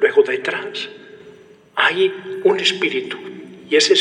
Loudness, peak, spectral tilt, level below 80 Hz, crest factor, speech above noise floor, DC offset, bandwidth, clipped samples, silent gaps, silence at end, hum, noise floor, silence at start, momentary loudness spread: -18 LUFS; -2 dBFS; -2.5 dB/octave; -76 dBFS; 18 dB; 26 dB; under 0.1%; 10.5 kHz; under 0.1%; none; 0 s; none; -45 dBFS; 0 s; 15 LU